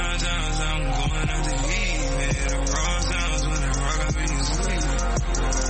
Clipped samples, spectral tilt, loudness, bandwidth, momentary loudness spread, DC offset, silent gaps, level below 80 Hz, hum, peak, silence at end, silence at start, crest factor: under 0.1%; -3.5 dB/octave; -25 LUFS; 8.8 kHz; 1 LU; under 0.1%; none; -24 dBFS; none; -12 dBFS; 0 s; 0 s; 12 dB